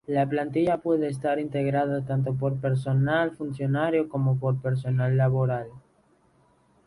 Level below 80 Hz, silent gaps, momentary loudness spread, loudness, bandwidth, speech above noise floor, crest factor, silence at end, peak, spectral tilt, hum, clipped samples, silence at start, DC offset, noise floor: -60 dBFS; none; 5 LU; -26 LUFS; 11 kHz; 38 dB; 14 dB; 1.1 s; -12 dBFS; -9 dB/octave; none; under 0.1%; 0.1 s; under 0.1%; -63 dBFS